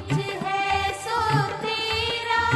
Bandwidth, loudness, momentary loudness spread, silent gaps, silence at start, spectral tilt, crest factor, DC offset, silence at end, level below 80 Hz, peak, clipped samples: 13 kHz; -24 LUFS; 3 LU; none; 0 s; -4.5 dB/octave; 16 dB; under 0.1%; 0 s; -46 dBFS; -8 dBFS; under 0.1%